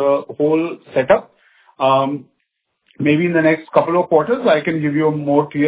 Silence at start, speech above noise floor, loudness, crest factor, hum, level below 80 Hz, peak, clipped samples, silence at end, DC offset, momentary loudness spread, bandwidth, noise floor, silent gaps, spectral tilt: 0 s; 56 dB; -17 LUFS; 16 dB; none; -58 dBFS; 0 dBFS; under 0.1%; 0 s; under 0.1%; 6 LU; 4 kHz; -72 dBFS; none; -10.5 dB/octave